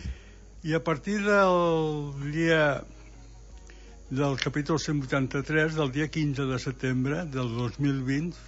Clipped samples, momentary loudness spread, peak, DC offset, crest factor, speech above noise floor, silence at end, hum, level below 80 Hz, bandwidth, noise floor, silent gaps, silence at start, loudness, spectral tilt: under 0.1%; 9 LU; -8 dBFS; under 0.1%; 20 dB; 21 dB; 0 s; none; -48 dBFS; 8 kHz; -48 dBFS; none; 0 s; -27 LUFS; -6 dB/octave